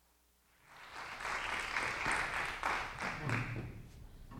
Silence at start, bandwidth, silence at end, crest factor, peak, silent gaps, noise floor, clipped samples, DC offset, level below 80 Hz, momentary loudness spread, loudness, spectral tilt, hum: 0.65 s; 17 kHz; 0 s; 22 dB; -20 dBFS; none; -71 dBFS; under 0.1%; under 0.1%; -56 dBFS; 18 LU; -38 LUFS; -3.5 dB/octave; none